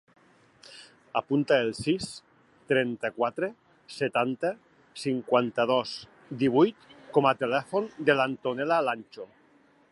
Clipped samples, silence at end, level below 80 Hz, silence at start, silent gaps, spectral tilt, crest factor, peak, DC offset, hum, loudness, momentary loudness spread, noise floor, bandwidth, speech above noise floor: under 0.1%; 0.65 s; -68 dBFS; 0.7 s; none; -5.5 dB/octave; 20 dB; -8 dBFS; under 0.1%; none; -27 LUFS; 20 LU; -61 dBFS; 11.5 kHz; 35 dB